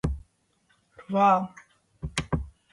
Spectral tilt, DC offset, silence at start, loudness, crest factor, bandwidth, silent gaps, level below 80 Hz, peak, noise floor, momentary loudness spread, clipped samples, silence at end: -6 dB/octave; under 0.1%; 0.05 s; -26 LUFS; 20 dB; 11.5 kHz; none; -42 dBFS; -8 dBFS; -68 dBFS; 18 LU; under 0.1%; 0.25 s